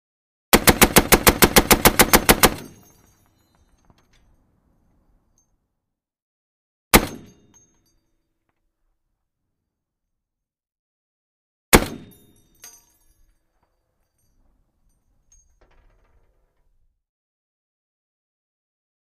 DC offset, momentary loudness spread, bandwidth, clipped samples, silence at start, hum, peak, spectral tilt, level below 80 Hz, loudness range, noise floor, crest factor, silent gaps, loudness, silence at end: under 0.1%; 5 LU; 15.5 kHz; under 0.1%; 0.55 s; none; 0 dBFS; -3 dB/octave; -36 dBFS; 10 LU; -84 dBFS; 24 dB; 6.22-6.91 s, 10.79-11.72 s; -15 LUFS; 7.15 s